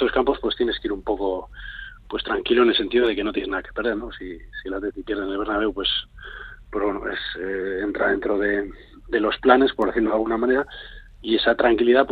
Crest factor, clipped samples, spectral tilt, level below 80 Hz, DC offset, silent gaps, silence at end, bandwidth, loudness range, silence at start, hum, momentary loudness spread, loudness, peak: 22 dB; under 0.1%; -6.5 dB/octave; -44 dBFS; under 0.1%; none; 0 s; 4.8 kHz; 5 LU; 0 s; none; 18 LU; -22 LUFS; 0 dBFS